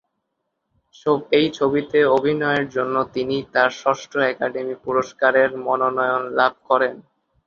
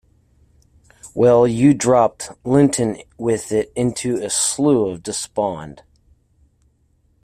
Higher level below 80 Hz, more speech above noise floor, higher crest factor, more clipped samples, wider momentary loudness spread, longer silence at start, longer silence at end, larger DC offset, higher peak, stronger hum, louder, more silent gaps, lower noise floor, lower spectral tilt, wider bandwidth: second, -60 dBFS vs -52 dBFS; first, 56 dB vs 43 dB; about the same, 18 dB vs 16 dB; neither; second, 6 LU vs 12 LU; about the same, 1.05 s vs 1.05 s; second, 0.45 s vs 1.5 s; neither; about the same, -2 dBFS vs -2 dBFS; neither; about the same, -20 LUFS vs -18 LUFS; neither; first, -76 dBFS vs -60 dBFS; about the same, -5.5 dB/octave vs -5 dB/octave; second, 7.2 kHz vs 15 kHz